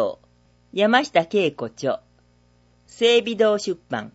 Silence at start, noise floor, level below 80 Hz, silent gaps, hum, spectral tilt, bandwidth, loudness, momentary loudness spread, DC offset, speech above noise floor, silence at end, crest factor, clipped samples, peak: 0 s; -58 dBFS; -64 dBFS; none; 60 Hz at -50 dBFS; -4 dB/octave; 8 kHz; -21 LUFS; 10 LU; under 0.1%; 38 dB; 0.05 s; 20 dB; under 0.1%; -2 dBFS